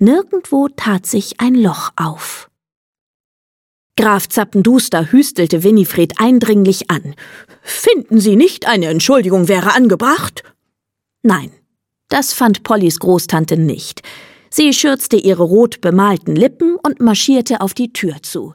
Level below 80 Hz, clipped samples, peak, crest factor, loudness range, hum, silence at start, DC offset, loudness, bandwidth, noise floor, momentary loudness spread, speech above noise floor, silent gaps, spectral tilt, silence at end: -56 dBFS; under 0.1%; 0 dBFS; 12 dB; 5 LU; none; 0 s; under 0.1%; -13 LUFS; 17.5 kHz; -78 dBFS; 10 LU; 65 dB; 2.76-2.93 s, 3.01-3.90 s; -5 dB/octave; 0 s